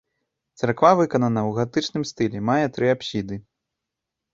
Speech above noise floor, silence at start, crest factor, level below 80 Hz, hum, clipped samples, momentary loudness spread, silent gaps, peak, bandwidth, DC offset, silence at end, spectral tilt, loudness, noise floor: 63 dB; 0.6 s; 20 dB; -58 dBFS; none; under 0.1%; 11 LU; none; -2 dBFS; 7.8 kHz; under 0.1%; 0.95 s; -6 dB/octave; -22 LUFS; -84 dBFS